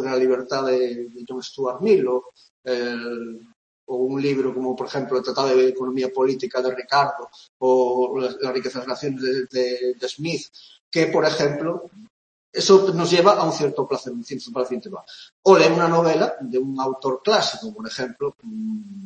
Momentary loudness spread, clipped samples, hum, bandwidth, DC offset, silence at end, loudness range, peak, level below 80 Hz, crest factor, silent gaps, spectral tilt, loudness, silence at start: 16 LU; under 0.1%; none; 8.6 kHz; under 0.1%; 0 s; 5 LU; 0 dBFS; -70 dBFS; 20 dB; 2.50-2.63 s, 3.56-3.87 s, 7.49-7.60 s, 10.80-10.92 s, 12.10-12.53 s, 15.32-15.43 s; -5 dB/octave; -21 LUFS; 0 s